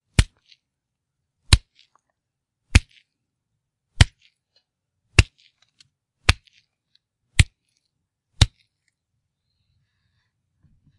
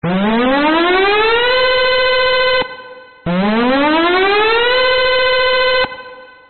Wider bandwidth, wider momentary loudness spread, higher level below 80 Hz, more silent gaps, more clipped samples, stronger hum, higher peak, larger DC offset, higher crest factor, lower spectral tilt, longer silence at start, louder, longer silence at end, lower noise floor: first, 11.5 kHz vs 4.5 kHz; about the same, 5 LU vs 6 LU; first, -30 dBFS vs -40 dBFS; neither; neither; neither; first, 0 dBFS vs -4 dBFS; second, under 0.1% vs 2%; first, 26 dB vs 10 dB; first, -3.5 dB/octave vs -1.5 dB/octave; first, 0.2 s vs 0 s; second, -22 LUFS vs -12 LUFS; first, 2.5 s vs 0 s; first, -82 dBFS vs -36 dBFS